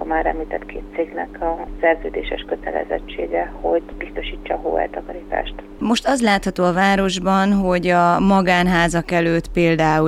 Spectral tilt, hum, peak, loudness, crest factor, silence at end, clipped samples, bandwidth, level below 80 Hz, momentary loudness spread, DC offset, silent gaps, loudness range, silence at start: -5.5 dB/octave; none; -4 dBFS; -19 LUFS; 16 dB; 0 s; under 0.1%; 13 kHz; -36 dBFS; 11 LU; under 0.1%; none; 8 LU; 0 s